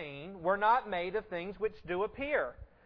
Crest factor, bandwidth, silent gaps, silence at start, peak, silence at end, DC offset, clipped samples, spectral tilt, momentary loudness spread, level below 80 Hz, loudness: 18 dB; 5.4 kHz; none; 0 s; -16 dBFS; 0.2 s; under 0.1%; under 0.1%; -8 dB/octave; 11 LU; -60 dBFS; -33 LUFS